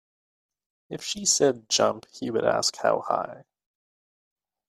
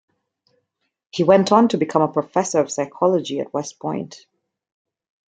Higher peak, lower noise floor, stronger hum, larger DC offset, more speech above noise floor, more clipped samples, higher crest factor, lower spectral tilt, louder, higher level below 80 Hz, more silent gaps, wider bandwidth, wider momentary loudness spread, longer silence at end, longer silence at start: second, -6 dBFS vs 0 dBFS; first, under -90 dBFS vs -72 dBFS; neither; neither; first, over 65 dB vs 53 dB; neither; about the same, 22 dB vs 20 dB; second, -2 dB/octave vs -5.5 dB/octave; second, -24 LUFS vs -19 LUFS; about the same, -68 dBFS vs -66 dBFS; neither; first, 14 kHz vs 9.4 kHz; about the same, 14 LU vs 13 LU; first, 1.25 s vs 1.1 s; second, 0.9 s vs 1.15 s